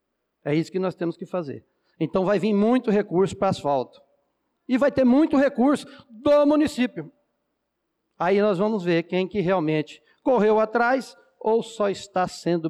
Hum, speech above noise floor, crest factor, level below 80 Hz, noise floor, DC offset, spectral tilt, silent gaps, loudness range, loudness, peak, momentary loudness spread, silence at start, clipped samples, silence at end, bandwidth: none; 56 dB; 12 dB; -60 dBFS; -78 dBFS; under 0.1%; -7 dB/octave; none; 3 LU; -23 LUFS; -12 dBFS; 12 LU; 0.45 s; under 0.1%; 0 s; 12.5 kHz